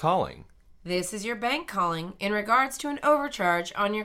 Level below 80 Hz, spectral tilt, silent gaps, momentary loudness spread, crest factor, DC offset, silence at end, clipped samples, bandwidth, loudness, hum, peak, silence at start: -56 dBFS; -4 dB/octave; none; 8 LU; 18 dB; under 0.1%; 0 s; under 0.1%; 16.5 kHz; -27 LUFS; none; -10 dBFS; 0 s